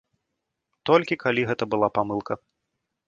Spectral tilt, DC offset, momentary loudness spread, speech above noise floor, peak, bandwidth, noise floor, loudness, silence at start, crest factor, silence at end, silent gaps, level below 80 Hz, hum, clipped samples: -6.5 dB/octave; under 0.1%; 13 LU; 58 dB; -4 dBFS; 7.4 kHz; -81 dBFS; -24 LUFS; 0.85 s; 22 dB; 0.7 s; none; -64 dBFS; none; under 0.1%